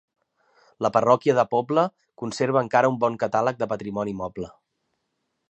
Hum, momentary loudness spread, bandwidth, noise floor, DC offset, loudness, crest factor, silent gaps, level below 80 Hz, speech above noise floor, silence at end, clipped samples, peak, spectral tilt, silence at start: none; 14 LU; 8.8 kHz; -77 dBFS; under 0.1%; -23 LUFS; 20 dB; none; -62 dBFS; 54 dB; 1 s; under 0.1%; -4 dBFS; -6 dB/octave; 0.8 s